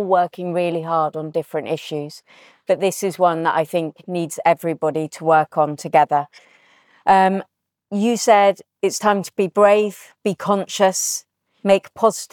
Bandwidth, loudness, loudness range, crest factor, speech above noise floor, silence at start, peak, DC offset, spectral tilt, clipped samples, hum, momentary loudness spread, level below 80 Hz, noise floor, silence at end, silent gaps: 19 kHz; -19 LUFS; 4 LU; 16 dB; 36 dB; 0 s; -4 dBFS; under 0.1%; -4.5 dB/octave; under 0.1%; none; 11 LU; -68 dBFS; -55 dBFS; 0.1 s; none